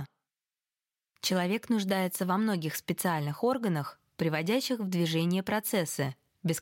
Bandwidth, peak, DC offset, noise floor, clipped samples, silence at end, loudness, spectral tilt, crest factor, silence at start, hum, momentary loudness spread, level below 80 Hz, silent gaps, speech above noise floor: 17 kHz; -16 dBFS; under 0.1%; under -90 dBFS; under 0.1%; 0 s; -30 LUFS; -5 dB/octave; 16 dB; 0 s; none; 6 LU; -72 dBFS; none; over 60 dB